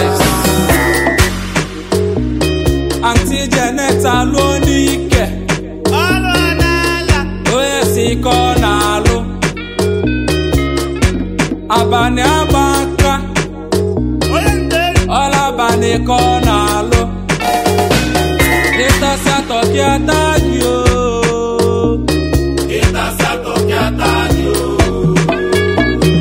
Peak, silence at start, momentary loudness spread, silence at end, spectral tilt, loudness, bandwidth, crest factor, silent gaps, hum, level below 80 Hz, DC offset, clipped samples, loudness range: 0 dBFS; 0 s; 5 LU; 0 s; -5 dB/octave; -13 LUFS; 16.5 kHz; 12 dB; none; none; -22 dBFS; 0.2%; under 0.1%; 2 LU